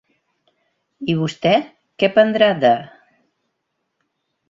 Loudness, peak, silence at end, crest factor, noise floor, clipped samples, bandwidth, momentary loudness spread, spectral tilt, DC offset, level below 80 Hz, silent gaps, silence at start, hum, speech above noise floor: -17 LUFS; -2 dBFS; 1.65 s; 20 dB; -74 dBFS; under 0.1%; 7.6 kHz; 9 LU; -6.5 dB/octave; under 0.1%; -62 dBFS; none; 1 s; none; 58 dB